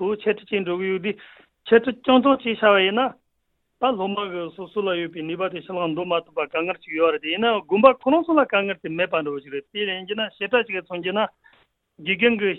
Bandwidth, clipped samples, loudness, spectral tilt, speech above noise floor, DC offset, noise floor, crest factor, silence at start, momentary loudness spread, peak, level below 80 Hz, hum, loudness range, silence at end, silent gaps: 4.2 kHz; under 0.1%; -22 LUFS; -8.5 dB/octave; 50 dB; under 0.1%; -72 dBFS; 22 dB; 0 s; 11 LU; 0 dBFS; -64 dBFS; none; 5 LU; 0 s; none